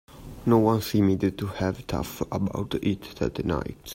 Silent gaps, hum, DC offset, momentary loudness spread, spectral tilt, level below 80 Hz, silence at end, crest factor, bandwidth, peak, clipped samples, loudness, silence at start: none; none; under 0.1%; 10 LU; -7 dB/octave; -46 dBFS; 0 s; 18 dB; 16 kHz; -8 dBFS; under 0.1%; -26 LUFS; 0.1 s